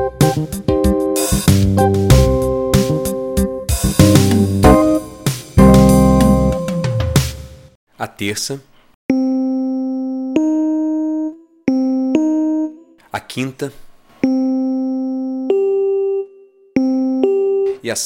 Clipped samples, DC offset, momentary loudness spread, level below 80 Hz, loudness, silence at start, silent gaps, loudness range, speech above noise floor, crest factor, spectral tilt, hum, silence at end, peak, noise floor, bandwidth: under 0.1%; under 0.1%; 13 LU; -26 dBFS; -15 LUFS; 0 s; 7.75-7.87 s, 8.94-9.09 s; 8 LU; 23 dB; 16 dB; -6 dB/octave; none; 0 s; 0 dBFS; -45 dBFS; 17 kHz